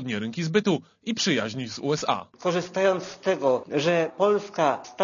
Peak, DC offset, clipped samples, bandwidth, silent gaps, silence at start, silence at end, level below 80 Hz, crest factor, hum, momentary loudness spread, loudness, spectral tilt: -8 dBFS; under 0.1%; under 0.1%; 7.4 kHz; none; 0 s; 0 s; -68 dBFS; 18 dB; none; 6 LU; -25 LUFS; -4.5 dB/octave